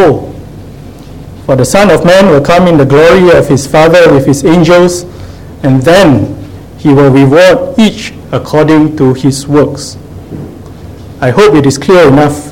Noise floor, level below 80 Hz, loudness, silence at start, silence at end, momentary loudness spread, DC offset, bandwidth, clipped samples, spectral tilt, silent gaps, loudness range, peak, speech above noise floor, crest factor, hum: -26 dBFS; -30 dBFS; -6 LUFS; 0 s; 0 s; 20 LU; 0.9%; 17 kHz; 4%; -6 dB/octave; none; 5 LU; 0 dBFS; 22 dB; 6 dB; none